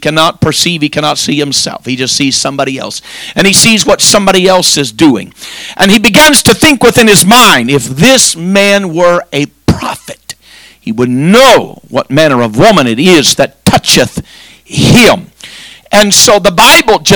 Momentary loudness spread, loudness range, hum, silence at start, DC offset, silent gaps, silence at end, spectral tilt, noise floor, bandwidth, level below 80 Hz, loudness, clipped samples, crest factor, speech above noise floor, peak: 14 LU; 5 LU; none; 0 s; under 0.1%; none; 0 s; -3 dB/octave; -37 dBFS; over 20 kHz; -34 dBFS; -6 LUFS; 10%; 8 dB; 31 dB; 0 dBFS